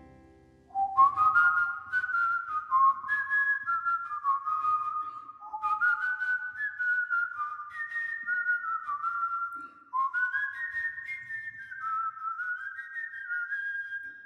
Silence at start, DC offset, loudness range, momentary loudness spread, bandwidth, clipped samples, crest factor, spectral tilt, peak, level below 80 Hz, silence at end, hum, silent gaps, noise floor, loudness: 0 s; under 0.1%; 7 LU; 13 LU; 9.8 kHz; under 0.1%; 18 dB; -2.5 dB/octave; -12 dBFS; -72 dBFS; 0 s; none; none; -57 dBFS; -29 LUFS